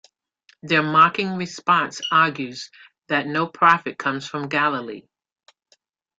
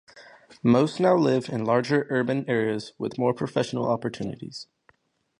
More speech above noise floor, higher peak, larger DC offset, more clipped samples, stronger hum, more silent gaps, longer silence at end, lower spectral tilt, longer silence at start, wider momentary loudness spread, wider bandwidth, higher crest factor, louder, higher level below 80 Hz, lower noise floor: about the same, 43 dB vs 40 dB; first, -2 dBFS vs -6 dBFS; neither; neither; neither; neither; first, 1.2 s vs 0.75 s; second, -4.5 dB/octave vs -7 dB/octave; first, 0.65 s vs 0.15 s; about the same, 15 LU vs 13 LU; second, 8 kHz vs 10.5 kHz; about the same, 20 dB vs 18 dB; first, -20 LUFS vs -25 LUFS; about the same, -66 dBFS vs -64 dBFS; about the same, -64 dBFS vs -64 dBFS